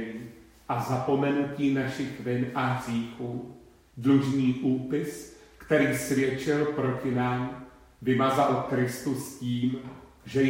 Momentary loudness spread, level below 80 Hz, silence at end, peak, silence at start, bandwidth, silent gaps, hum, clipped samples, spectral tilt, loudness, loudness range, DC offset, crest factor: 14 LU; -60 dBFS; 0 s; -10 dBFS; 0 s; 16 kHz; none; none; under 0.1%; -6.5 dB/octave; -28 LUFS; 2 LU; under 0.1%; 18 dB